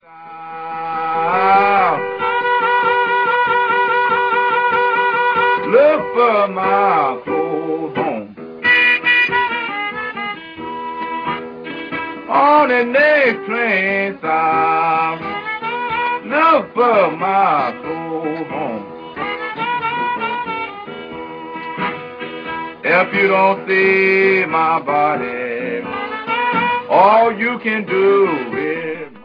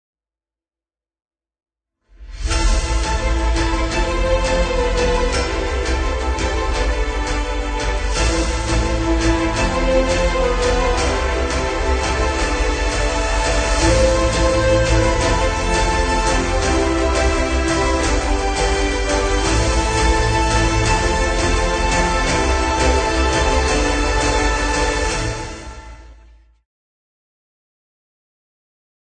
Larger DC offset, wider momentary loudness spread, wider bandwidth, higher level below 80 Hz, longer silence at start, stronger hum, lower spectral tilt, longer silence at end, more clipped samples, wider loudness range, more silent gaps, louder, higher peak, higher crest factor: neither; first, 14 LU vs 4 LU; second, 5.2 kHz vs 9.4 kHz; second, -60 dBFS vs -22 dBFS; second, 0.1 s vs 2.2 s; neither; first, -7 dB/octave vs -4.5 dB/octave; second, 0 s vs 3.05 s; neither; about the same, 7 LU vs 5 LU; neither; about the same, -16 LUFS vs -18 LUFS; about the same, 0 dBFS vs -2 dBFS; about the same, 16 dB vs 16 dB